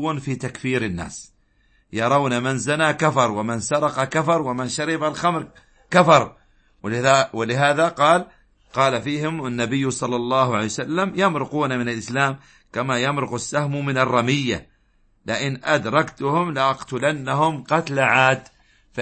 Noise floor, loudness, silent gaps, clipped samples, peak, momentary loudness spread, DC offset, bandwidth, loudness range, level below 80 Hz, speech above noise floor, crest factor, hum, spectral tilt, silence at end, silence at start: -60 dBFS; -21 LUFS; none; under 0.1%; -2 dBFS; 10 LU; under 0.1%; 8.8 kHz; 4 LU; -56 dBFS; 40 dB; 20 dB; none; -5 dB/octave; 0 s; 0 s